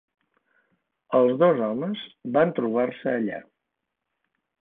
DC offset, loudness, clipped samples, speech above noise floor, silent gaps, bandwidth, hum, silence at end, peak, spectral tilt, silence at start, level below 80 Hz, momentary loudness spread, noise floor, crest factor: under 0.1%; -24 LUFS; under 0.1%; 59 dB; none; 3.9 kHz; none; 1.2 s; -8 dBFS; -11 dB/octave; 1.1 s; -72 dBFS; 12 LU; -82 dBFS; 18 dB